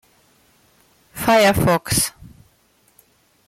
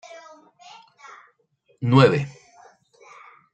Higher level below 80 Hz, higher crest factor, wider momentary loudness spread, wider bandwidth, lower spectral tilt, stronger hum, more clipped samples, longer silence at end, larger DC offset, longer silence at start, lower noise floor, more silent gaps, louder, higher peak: first, -44 dBFS vs -62 dBFS; second, 16 dB vs 24 dB; second, 10 LU vs 27 LU; first, 16.5 kHz vs 8.6 kHz; second, -4 dB/octave vs -7.5 dB/octave; neither; neither; first, 1.4 s vs 1.25 s; neither; second, 1.15 s vs 1.8 s; second, -59 dBFS vs -65 dBFS; neither; about the same, -17 LUFS vs -19 LUFS; second, -6 dBFS vs -2 dBFS